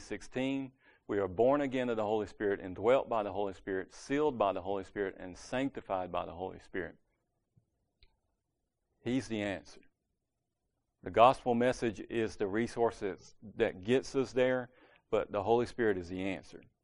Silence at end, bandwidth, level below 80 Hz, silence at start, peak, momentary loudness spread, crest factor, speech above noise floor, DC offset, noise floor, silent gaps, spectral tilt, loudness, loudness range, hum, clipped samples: 0.2 s; 10.5 kHz; -62 dBFS; 0 s; -10 dBFS; 12 LU; 24 dB; 53 dB; under 0.1%; -86 dBFS; none; -6 dB/octave; -33 LUFS; 10 LU; none; under 0.1%